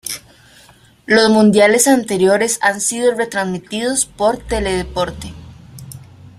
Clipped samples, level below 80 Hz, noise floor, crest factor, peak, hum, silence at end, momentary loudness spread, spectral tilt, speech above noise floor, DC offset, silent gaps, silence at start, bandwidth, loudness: under 0.1%; -38 dBFS; -47 dBFS; 16 dB; 0 dBFS; none; 0.4 s; 19 LU; -3.5 dB/octave; 32 dB; under 0.1%; none; 0.05 s; 15 kHz; -15 LUFS